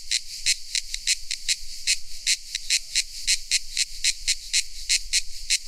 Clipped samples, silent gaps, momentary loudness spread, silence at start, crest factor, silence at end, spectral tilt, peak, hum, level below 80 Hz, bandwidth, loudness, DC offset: under 0.1%; none; 4 LU; 0 s; 20 dB; 0 s; 4.5 dB/octave; -6 dBFS; none; -40 dBFS; 16.5 kHz; -24 LUFS; under 0.1%